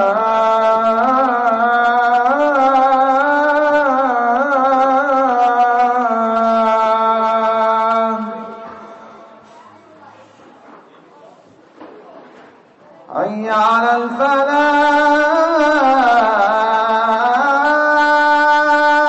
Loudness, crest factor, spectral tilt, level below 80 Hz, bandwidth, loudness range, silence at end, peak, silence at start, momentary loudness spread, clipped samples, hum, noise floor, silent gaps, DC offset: -13 LUFS; 12 dB; -4.5 dB/octave; -60 dBFS; 8.2 kHz; 8 LU; 0 s; -4 dBFS; 0 s; 4 LU; under 0.1%; none; -45 dBFS; none; under 0.1%